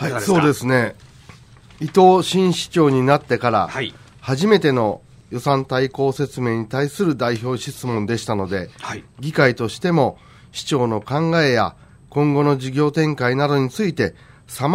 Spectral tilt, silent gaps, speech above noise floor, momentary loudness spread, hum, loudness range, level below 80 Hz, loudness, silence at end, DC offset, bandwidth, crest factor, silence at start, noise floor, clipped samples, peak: -6 dB/octave; none; 26 dB; 11 LU; none; 4 LU; -52 dBFS; -19 LUFS; 0 s; under 0.1%; 16 kHz; 18 dB; 0 s; -44 dBFS; under 0.1%; -2 dBFS